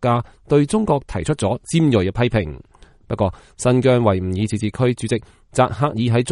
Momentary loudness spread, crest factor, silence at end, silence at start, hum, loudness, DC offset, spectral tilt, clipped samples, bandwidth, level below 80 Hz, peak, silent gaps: 7 LU; 16 dB; 0 s; 0 s; none; -19 LUFS; under 0.1%; -6.5 dB/octave; under 0.1%; 11.5 kHz; -42 dBFS; -2 dBFS; none